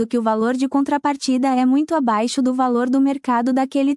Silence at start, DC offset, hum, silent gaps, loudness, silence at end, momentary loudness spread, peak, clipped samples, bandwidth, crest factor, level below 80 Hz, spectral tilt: 0 s; under 0.1%; none; none; -19 LUFS; 0 s; 3 LU; -6 dBFS; under 0.1%; 11.5 kHz; 12 dB; -68 dBFS; -4.5 dB/octave